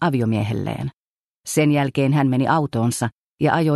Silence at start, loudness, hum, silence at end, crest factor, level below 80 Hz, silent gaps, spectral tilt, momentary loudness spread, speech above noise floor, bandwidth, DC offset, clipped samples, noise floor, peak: 0 s; -20 LUFS; none; 0 s; 16 dB; -54 dBFS; 0.96-1.43 s, 3.12-3.38 s; -6 dB/octave; 10 LU; 52 dB; 12.5 kHz; under 0.1%; under 0.1%; -71 dBFS; -4 dBFS